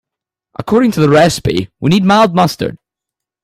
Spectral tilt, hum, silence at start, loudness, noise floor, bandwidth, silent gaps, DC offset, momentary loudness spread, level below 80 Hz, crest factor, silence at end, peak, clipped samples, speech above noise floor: -6 dB/octave; none; 0.6 s; -12 LUFS; -83 dBFS; 15.5 kHz; none; under 0.1%; 13 LU; -42 dBFS; 12 dB; 0.7 s; 0 dBFS; under 0.1%; 72 dB